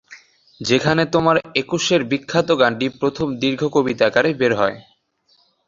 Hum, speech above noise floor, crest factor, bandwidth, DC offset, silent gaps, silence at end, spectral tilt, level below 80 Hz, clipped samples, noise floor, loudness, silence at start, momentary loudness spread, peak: none; 43 dB; 18 dB; 7.6 kHz; under 0.1%; none; 0.85 s; -5 dB/octave; -54 dBFS; under 0.1%; -61 dBFS; -18 LUFS; 0.1 s; 5 LU; 0 dBFS